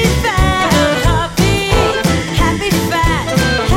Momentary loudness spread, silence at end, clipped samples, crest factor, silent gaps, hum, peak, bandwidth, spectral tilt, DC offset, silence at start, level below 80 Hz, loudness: 3 LU; 0 s; under 0.1%; 12 dB; none; none; 0 dBFS; 17 kHz; -4.5 dB/octave; under 0.1%; 0 s; -20 dBFS; -13 LUFS